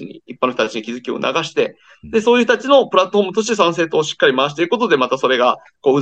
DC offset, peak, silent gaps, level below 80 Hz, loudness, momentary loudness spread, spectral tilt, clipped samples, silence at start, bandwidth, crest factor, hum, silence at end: under 0.1%; 0 dBFS; none; -60 dBFS; -16 LUFS; 8 LU; -4 dB/octave; under 0.1%; 0 s; 8.6 kHz; 16 dB; none; 0 s